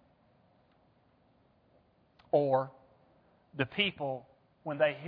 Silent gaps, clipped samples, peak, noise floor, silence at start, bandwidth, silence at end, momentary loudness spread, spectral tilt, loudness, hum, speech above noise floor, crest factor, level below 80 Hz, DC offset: none; under 0.1%; -14 dBFS; -68 dBFS; 2.3 s; 5 kHz; 0 s; 15 LU; -3 dB/octave; -32 LUFS; none; 37 dB; 22 dB; -74 dBFS; under 0.1%